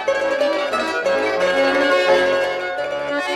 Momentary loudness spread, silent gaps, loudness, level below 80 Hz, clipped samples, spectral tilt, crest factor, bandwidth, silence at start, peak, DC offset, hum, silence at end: 7 LU; none; -18 LUFS; -56 dBFS; under 0.1%; -3 dB/octave; 14 dB; 12.5 kHz; 0 s; -4 dBFS; under 0.1%; none; 0 s